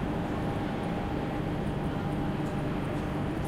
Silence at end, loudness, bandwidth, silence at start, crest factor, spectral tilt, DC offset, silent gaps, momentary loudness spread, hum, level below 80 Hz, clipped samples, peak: 0 s; -32 LUFS; 14.5 kHz; 0 s; 12 dB; -7.5 dB/octave; under 0.1%; none; 1 LU; none; -42 dBFS; under 0.1%; -20 dBFS